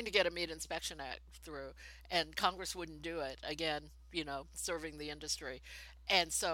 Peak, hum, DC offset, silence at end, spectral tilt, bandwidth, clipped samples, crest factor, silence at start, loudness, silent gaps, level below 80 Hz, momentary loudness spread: -14 dBFS; none; under 0.1%; 0 s; -2 dB/octave; 17 kHz; under 0.1%; 26 dB; 0 s; -38 LUFS; none; -58 dBFS; 15 LU